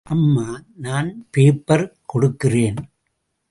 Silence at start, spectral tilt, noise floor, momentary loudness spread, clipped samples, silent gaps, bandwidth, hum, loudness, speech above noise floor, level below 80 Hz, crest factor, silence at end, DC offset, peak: 0.1 s; -7.5 dB/octave; -73 dBFS; 11 LU; under 0.1%; none; 11.5 kHz; none; -19 LUFS; 55 dB; -50 dBFS; 16 dB; 0.65 s; under 0.1%; -2 dBFS